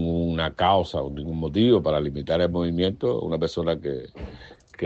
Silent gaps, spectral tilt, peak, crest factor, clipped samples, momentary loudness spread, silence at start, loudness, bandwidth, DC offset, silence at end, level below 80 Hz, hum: none; -7.5 dB/octave; -6 dBFS; 18 dB; under 0.1%; 12 LU; 0 s; -24 LUFS; 8 kHz; under 0.1%; 0 s; -42 dBFS; none